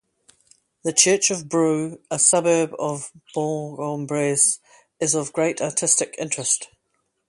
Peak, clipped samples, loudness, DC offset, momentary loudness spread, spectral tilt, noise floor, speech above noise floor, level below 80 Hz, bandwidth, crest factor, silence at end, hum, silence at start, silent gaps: 0 dBFS; under 0.1%; -21 LUFS; under 0.1%; 12 LU; -3 dB/octave; -72 dBFS; 51 dB; -68 dBFS; 11.5 kHz; 22 dB; 0.65 s; none; 0.85 s; none